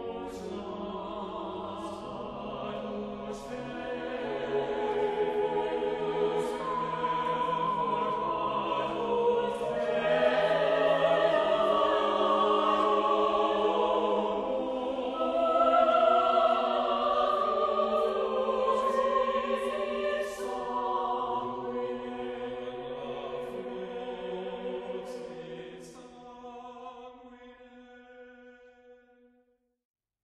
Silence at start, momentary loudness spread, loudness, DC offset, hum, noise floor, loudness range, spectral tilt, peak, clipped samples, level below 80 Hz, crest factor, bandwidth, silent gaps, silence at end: 0 s; 14 LU; -29 LUFS; under 0.1%; none; -71 dBFS; 14 LU; -5 dB/octave; -12 dBFS; under 0.1%; -62 dBFS; 18 dB; 12.5 kHz; none; 1.3 s